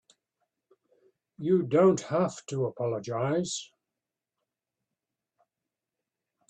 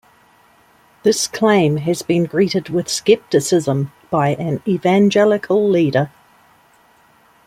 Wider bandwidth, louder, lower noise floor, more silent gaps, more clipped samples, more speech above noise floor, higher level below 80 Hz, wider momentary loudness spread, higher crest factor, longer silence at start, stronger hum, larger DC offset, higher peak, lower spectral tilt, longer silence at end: second, 9.4 kHz vs 16 kHz; second, -28 LUFS vs -17 LUFS; first, -89 dBFS vs -52 dBFS; neither; neither; first, 62 dB vs 37 dB; second, -72 dBFS vs -58 dBFS; first, 11 LU vs 7 LU; about the same, 20 dB vs 16 dB; first, 1.4 s vs 1.05 s; neither; neither; second, -10 dBFS vs -2 dBFS; about the same, -6 dB/octave vs -5.5 dB/octave; first, 2.85 s vs 1.4 s